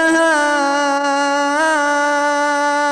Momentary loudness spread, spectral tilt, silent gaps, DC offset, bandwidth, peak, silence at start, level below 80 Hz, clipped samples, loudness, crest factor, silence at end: 3 LU; -1 dB/octave; none; under 0.1%; 13.5 kHz; -6 dBFS; 0 s; -64 dBFS; under 0.1%; -15 LUFS; 10 dB; 0 s